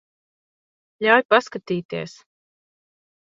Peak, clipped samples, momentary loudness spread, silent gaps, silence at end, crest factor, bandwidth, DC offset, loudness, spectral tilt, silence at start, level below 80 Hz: 0 dBFS; under 0.1%; 16 LU; 1.25-1.29 s, 1.85-1.89 s; 1.15 s; 24 dB; 7.8 kHz; under 0.1%; -20 LUFS; -5 dB/octave; 1 s; -70 dBFS